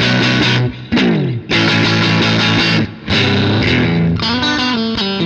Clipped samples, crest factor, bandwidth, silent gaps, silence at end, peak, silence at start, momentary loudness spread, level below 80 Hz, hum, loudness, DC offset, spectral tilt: under 0.1%; 14 dB; 8.2 kHz; none; 0 s; 0 dBFS; 0 s; 5 LU; -38 dBFS; none; -13 LUFS; under 0.1%; -5.5 dB/octave